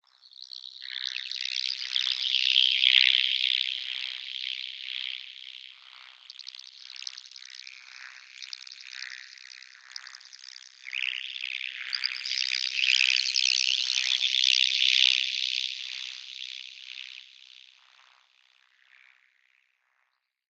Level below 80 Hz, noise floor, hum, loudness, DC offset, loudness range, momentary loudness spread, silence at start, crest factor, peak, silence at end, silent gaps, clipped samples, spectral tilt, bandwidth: under -90 dBFS; -77 dBFS; none; -24 LUFS; under 0.1%; 20 LU; 24 LU; 0.4 s; 28 dB; -2 dBFS; 3.3 s; none; under 0.1%; 8.5 dB/octave; 15 kHz